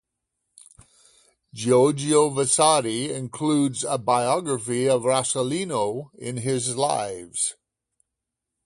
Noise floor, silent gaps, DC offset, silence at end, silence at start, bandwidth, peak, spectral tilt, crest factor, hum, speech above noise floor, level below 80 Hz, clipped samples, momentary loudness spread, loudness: -84 dBFS; none; under 0.1%; 1.1 s; 1.55 s; 11.5 kHz; -2 dBFS; -4 dB/octave; 22 dB; none; 61 dB; -64 dBFS; under 0.1%; 10 LU; -23 LUFS